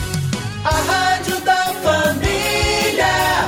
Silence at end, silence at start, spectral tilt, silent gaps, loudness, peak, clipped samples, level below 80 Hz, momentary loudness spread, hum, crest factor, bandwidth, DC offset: 0 s; 0 s; -3.5 dB/octave; none; -17 LUFS; -4 dBFS; under 0.1%; -32 dBFS; 6 LU; none; 12 dB; 16.5 kHz; under 0.1%